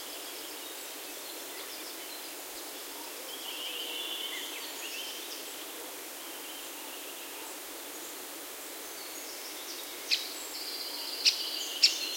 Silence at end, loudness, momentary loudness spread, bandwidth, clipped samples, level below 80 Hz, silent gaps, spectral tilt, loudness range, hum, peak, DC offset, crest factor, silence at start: 0 s; -35 LUFS; 13 LU; 16.5 kHz; under 0.1%; -82 dBFS; none; 1.5 dB/octave; 7 LU; none; -8 dBFS; under 0.1%; 30 dB; 0 s